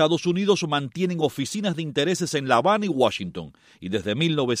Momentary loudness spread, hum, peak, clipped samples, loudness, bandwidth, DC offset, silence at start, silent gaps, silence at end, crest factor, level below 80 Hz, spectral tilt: 10 LU; none; -4 dBFS; under 0.1%; -23 LUFS; 15.5 kHz; under 0.1%; 0 s; none; 0 s; 18 dB; -62 dBFS; -5 dB/octave